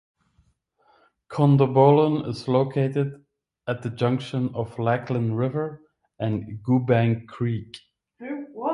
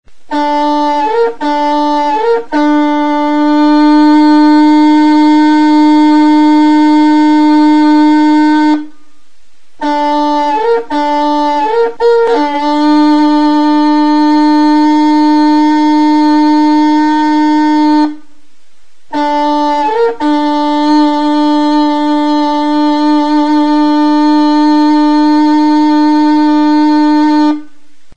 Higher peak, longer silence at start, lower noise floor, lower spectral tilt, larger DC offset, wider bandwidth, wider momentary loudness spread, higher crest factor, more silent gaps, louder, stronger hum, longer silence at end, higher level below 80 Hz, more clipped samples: second, -4 dBFS vs 0 dBFS; first, 1.3 s vs 0 s; first, -65 dBFS vs -53 dBFS; first, -9 dB/octave vs -4 dB/octave; second, under 0.1% vs 5%; first, 10.5 kHz vs 8 kHz; first, 17 LU vs 5 LU; first, 20 dB vs 8 dB; neither; second, -23 LUFS vs -9 LUFS; neither; about the same, 0 s vs 0 s; second, -60 dBFS vs -54 dBFS; neither